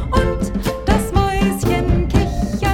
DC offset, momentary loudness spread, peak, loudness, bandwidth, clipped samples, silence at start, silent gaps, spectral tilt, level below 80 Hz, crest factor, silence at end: under 0.1%; 4 LU; -2 dBFS; -18 LUFS; 17 kHz; under 0.1%; 0 s; none; -6.5 dB/octave; -22 dBFS; 16 dB; 0 s